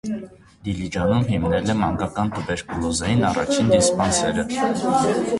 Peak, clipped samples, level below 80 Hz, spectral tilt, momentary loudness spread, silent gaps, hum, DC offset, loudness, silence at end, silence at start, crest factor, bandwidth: -4 dBFS; under 0.1%; -40 dBFS; -5 dB/octave; 10 LU; none; none; under 0.1%; -21 LUFS; 0 s; 0.05 s; 16 dB; 11.5 kHz